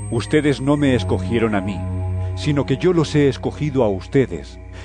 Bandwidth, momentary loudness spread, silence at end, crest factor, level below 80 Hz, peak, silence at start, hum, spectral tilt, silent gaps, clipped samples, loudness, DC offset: 10 kHz; 8 LU; 0 s; 14 dB; -38 dBFS; -4 dBFS; 0 s; none; -7 dB/octave; none; under 0.1%; -19 LUFS; under 0.1%